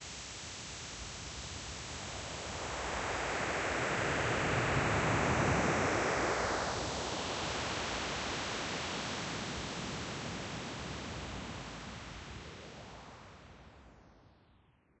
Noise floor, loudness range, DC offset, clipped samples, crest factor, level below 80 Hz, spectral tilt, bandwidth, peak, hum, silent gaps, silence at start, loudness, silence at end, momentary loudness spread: -67 dBFS; 14 LU; under 0.1%; under 0.1%; 18 dB; -52 dBFS; -3.5 dB/octave; 8.6 kHz; -18 dBFS; none; none; 0 s; -36 LUFS; 0.7 s; 16 LU